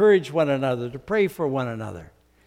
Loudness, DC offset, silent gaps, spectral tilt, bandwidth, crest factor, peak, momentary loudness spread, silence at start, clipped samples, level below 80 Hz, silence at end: -24 LUFS; under 0.1%; none; -7 dB/octave; 15.5 kHz; 16 dB; -8 dBFS; 14 LU; 0 s; under 0.1%; -58 dBFS; 0.4 s